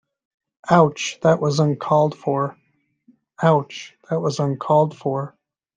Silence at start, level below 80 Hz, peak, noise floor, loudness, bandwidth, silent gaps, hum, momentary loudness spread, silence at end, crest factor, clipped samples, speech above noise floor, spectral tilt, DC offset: 0.65 s; -64 dBFS; -2 dBFS; -59 dBFS; -20 LUFS; 9.2 kHz; none; none; 11 LU; 0.5 s; 20 dB; under 0.1%; 40 dB; -6.5 dB/octave; under 0.1%